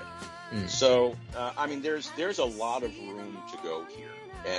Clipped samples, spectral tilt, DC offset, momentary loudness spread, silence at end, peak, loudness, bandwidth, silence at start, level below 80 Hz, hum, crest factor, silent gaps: under 0.1%; -3.5 dB/octave; under 0.1%; 18 LU; 0 s; -10 dBFS; -30 LUFS; 11 kHz; 0 s; -56 dBFS; none; 22 dB; none